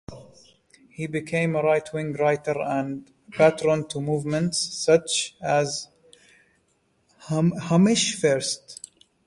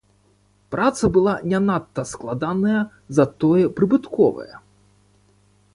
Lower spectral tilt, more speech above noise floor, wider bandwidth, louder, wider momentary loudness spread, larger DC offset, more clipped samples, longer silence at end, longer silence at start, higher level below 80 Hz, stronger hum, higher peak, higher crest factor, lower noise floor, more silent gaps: second, -4.5 dB/octave vs -7 dB/octave; first, 45 dB vs 40 dB; about the same, 11.5 kHz vs 11.5 kHz; second, -23 LUFS vs -20 LUFS; first, 15 LU vs 11 LU; neither; neither; second, 0.5 s vs 1.15 s; second, 0.1 s vs 0.7 s; second, -60 dBFS vs -50 dBFS; second, none vs 50 Hz at -40 dBFS; about the same, -6 dBFS vs -4 dBFS; about the same, 20 dB vs 18 dB; first, -68 dBFS vs -59 dBFS; neither